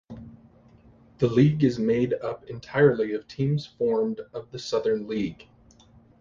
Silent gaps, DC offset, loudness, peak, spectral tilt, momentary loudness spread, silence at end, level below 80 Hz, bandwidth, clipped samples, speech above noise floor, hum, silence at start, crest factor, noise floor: none; under 0.1%; -25 LUFS; -6 dBFS; -7.5 dB/octave; 15 LU; 0.85 s; -56 dBFS; 7.4 kHz; under 0.1%; 31 dB; none; 0.1 s; 20 dB; -55 dBFS